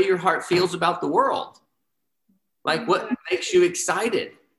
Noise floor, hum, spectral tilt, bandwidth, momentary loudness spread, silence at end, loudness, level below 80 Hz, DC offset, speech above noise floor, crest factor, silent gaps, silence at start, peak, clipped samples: -80 dBFS; none; -3.5 dB/octave; 12.5 kHz; 8 LU; 0.3 s; -22 LUFS; -68 dBFS; under 0.1%; 58 dB; 18 dB; none; 0 s; -6 dBFS; under 0.1%